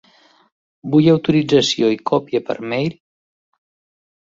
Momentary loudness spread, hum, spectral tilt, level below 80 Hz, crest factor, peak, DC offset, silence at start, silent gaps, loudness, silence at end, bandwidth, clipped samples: 9 LU; none; -6 dB/octave; -58 dBFS; 18 dB; -2 dBFS; under 0.1%; 0.85 s; none; -17 LUFS; 1.3 s; 7.8 kHz; under 0.1%